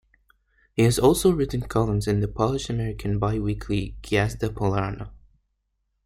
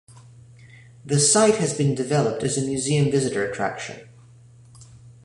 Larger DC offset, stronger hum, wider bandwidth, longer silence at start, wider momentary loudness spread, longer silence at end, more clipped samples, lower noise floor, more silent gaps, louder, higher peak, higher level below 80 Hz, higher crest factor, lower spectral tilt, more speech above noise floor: neither; neither; first, 16 kHz vs 11.5 kHz; first, 0.75 s vs 0.1 s; about the same, 10 LU vs 11 LU; first, 0.9 s vs 0.15 s; neither; first, -75 dBFS vs -49 dBFS; neither; second, -24 LUFS vs -21 LUFS; about the same, -6 dBFS vs -6 dBFS; first, -40 dBFS vs -58 dBFS; about the same, 18 dB vs 18 dB; first, -6 dB/octave vs -4.5 dB/octave; first, 52 dB vs 28 dB